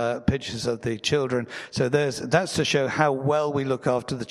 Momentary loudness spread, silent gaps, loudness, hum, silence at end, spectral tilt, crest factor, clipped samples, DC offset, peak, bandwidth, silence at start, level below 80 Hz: 5 LU; none; -24 LUFS; none; 0.05 s; -5 dB/octave; 20 dB; under 0.1%; under 0.1%; -4 dBFS; 13.5 kHz; 0 s; -50 dBFS